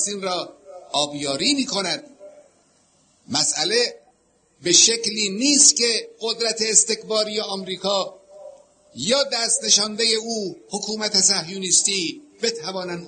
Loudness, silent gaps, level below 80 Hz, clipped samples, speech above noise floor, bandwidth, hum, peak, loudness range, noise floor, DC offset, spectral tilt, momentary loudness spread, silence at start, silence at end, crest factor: -19 LUFS; none; -68 dBFS; under 0.1%; 41 dB; 9.6 kHz; none; -2 dBFS; 7 LU; -62 dBFS; under 0.1%; -1 dB/octave; 15 LU; 0 s; 0 s; 22 dB